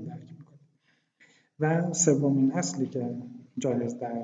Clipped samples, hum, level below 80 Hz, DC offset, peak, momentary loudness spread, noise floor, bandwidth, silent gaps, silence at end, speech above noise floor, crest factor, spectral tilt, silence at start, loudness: under 0.1%; none; -78 dBFS; under 0.1%; -8 dBFS; 17 LU; -70 dBFS; 9.4 kHz; none; 0 s; 44 dB; 20 dB; -5.5 dB/octave; 0 s; -27 LUFS